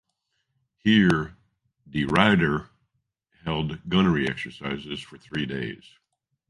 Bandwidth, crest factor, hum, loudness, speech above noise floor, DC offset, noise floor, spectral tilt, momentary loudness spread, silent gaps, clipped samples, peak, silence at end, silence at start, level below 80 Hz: 11.5 kHz; 24 dB; none; -24 LUFS; 53 dB; under 0.1%; -77 dBFS; -6.5 dB/octave; 16 LU; none; under 0.1%; -2 dBFS; 0.75 s; 0.85 s; -50 dBFS